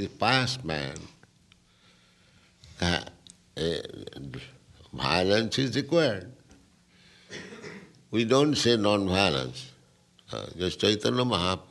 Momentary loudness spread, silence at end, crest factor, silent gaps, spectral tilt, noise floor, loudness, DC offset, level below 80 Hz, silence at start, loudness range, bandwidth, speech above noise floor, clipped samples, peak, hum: 21 LU; 0.05 s; 22 dB; none; -4.5 dB/octave; -61 dBFS; -26 LUFS; under 0.1%; -56 dBFS; 0 s; 9 LU; 12 kHz; 35 dB; under 0.1%; -6 dBFS; none